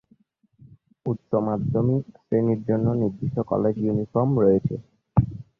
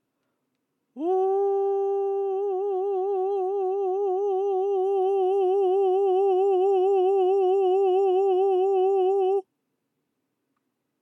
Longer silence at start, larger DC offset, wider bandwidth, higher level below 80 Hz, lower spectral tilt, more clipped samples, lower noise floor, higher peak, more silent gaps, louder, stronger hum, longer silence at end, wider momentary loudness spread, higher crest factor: about the same, 1.05 s vs 0.95 s; neither; second, 2.8 kHz vs 3.3 kHz; first, -48 dBFS vs under -90 dBFS; first, -12.5 dB/octave vs -5.5 dB/octave; neither; second, -62 dBFS vs -78 dBFS; first, -6 dBFS vs -16 dBFS; neither; about the same, -24 LUFS vs -23 LUFS; neither; second, 0.15 s vs 1.6 s; first, 9 LU vs 5 LU; first, 18 dB vs 8 dB